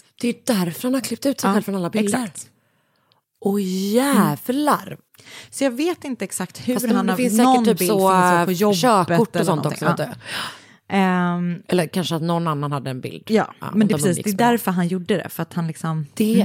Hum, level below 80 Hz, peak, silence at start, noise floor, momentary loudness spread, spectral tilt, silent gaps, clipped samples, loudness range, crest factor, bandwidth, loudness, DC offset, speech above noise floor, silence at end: none; -68 dBFS; -4 dBFS; 0.2 s; -64 dBFS; 11 LU; -5.5 dB/octave; none; under 0.1%; 5 LU; 16 dB; 17 kHz; -20 LUFS; under 0.1%; 44 dB; 0 s